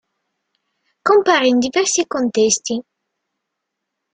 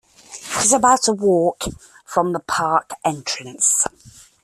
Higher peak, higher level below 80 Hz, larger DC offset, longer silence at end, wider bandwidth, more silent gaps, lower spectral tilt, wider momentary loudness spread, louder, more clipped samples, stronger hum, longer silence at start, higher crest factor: about the same, 0 dBFS vs -2 dBFS; second, -62 dBFS vs -50 dBFS; neither; first, 1.35 s vs 0.55 s; second, 9.6 kHz vs 15 kHz; neither; about the same, -2 dB/octave vs -2.5 dB/octave; second, 10 LU vs 13 LU; about the same, -16 LUFS vs -18 LUFS; neither; neither; first, 1.05 s vs 0.3 s; about the same, 18 dB vs 18 dB